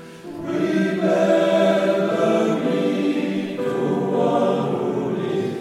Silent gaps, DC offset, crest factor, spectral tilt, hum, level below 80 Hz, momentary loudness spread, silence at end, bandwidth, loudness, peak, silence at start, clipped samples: none; under 0.1%; 14 dB; -6.5 dB/octave; none; -64 dBFS; 7 LU; 0 s; 13.5 kHz; -20 LUFS; -6 dBFS; 0 s; under 0.1%